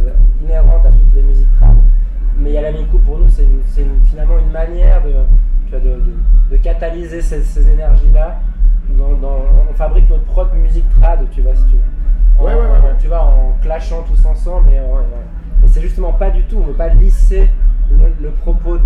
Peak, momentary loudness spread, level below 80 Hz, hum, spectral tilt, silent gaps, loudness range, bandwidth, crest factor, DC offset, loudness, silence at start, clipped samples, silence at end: 0 dBFS; 7 LU; -8 dBFS; none; -9 dB/octave; none; 2 LU; 2.6 kHz; 8 dB; under 0.1%; -15 LUFS; 0 s; under 0.1%; 0 s